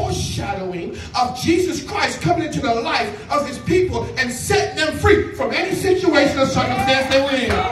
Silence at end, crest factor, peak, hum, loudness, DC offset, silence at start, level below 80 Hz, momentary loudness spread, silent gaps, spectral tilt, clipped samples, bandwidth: 0 s; 18 dB; -2 dBFS; none; -19 LUFS; under 0.1%; 0 s; -38 dBFS; 7 LU; none; -4.5 dB/octave; under 0.1%; 14 kHz